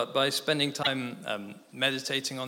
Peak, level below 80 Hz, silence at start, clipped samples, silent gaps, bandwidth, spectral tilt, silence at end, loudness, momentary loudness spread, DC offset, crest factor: -10 dBFS; -78 dBFS; 0 s; under 0.1%; none; 17 kHz; -3 dB/octave; 0 s; -29 LUFS; 9 LU; under 0.1%; 20 dB